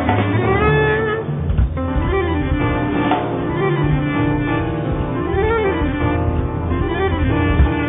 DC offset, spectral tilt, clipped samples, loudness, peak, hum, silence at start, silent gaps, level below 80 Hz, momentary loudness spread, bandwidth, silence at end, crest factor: under 0.1%; -6.5 dB/octave; under 0.1%; -18 LUFS; -2 dBFS; none; 0 s; none; -24 dBFS; 5 LU; 3.9 kHz; 0 s; 14 dB